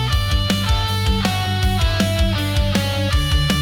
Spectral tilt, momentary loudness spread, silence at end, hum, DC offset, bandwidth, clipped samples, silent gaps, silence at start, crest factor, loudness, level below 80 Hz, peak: -5 dB/octave; 1 LU; 0 s; none; under 0.1%; 17.5 kHz; under 0.1%; none; 0 s; 12 dB; -19 LUFS; -22 dBFS; -6 dBFS